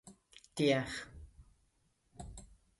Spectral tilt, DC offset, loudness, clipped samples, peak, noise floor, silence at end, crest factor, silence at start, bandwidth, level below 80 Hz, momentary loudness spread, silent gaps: -5 dB/octave; under 0.1%; -35 LUFS; under 0.1%; -18 dBFS; -76 dBFS; 0.35 s; 22 dB; 0.05 s; 11.5 kHz; -60 dBFS; 25 LU; none